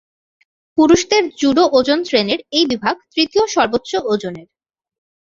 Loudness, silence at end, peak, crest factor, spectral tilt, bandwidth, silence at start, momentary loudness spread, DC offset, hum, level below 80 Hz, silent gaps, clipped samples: -16 LUFS; 0.95 s; 0 dBFS; 16 dB; -3.5 dB/octave; 7.6 kHz; 0.75 s; 8 LU; under 0.1%; none; -52 dBFS; none; under 0.1%